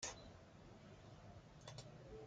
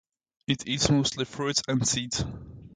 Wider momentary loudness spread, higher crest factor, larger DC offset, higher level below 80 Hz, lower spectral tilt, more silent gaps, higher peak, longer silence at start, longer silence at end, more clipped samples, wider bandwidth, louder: second, 6 LU vs 12 LU; about the same, 24 dB vs 22 dB; neither; second, -70 dBFS vs -48 dBFS; about the same, -3 dB/octave vs -3.5 dB/octave; neither; second, -32 dBFS vs -6 dBFS; second, 0 s vs 0.5 s; about the same, 0 s vs 0.05 s; neither; about the same, 10 kHz vs 9.6 kHz; second, -58 LUFS vs -27 LUFS